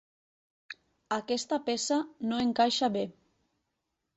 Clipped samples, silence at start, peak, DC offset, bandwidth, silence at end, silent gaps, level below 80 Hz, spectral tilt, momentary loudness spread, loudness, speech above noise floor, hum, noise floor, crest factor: under 0.1%; 0.7 s; -14 dBFS; under 0.1%; 8.2 kHz; 1.05 s; none; -70 dBFS; -3.5 dB/octave; 21 LU; -30 LUFS; 53 dB; none; -83 dBFS; 20 dB